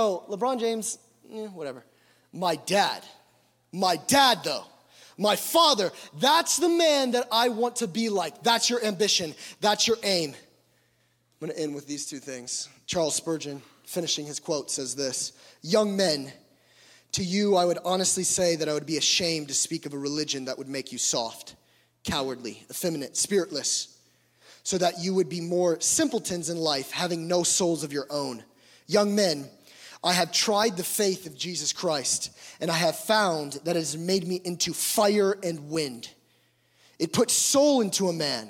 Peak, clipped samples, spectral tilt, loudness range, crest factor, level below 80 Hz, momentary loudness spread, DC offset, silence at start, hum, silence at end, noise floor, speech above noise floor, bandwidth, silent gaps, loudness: -6 dBFS; under 0.1%; -2.5 dB/octave; 7 LU; 20 dB; -66 dBFS; 13 LU; under 0.1%; 0 s; none; 0 s; -68 dBFS; 42 dB; 17.5 kHz; none; -25 LUFS